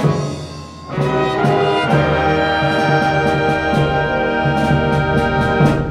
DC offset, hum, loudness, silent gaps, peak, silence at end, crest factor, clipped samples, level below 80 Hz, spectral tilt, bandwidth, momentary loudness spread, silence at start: under 0.1%; none; -16 LUFS; none; 0 dBFS; 0 s; 14 dB; under 0.1%; -32 dBFS; -7 dB/octave; 11 kHz; 7 LU; 0 s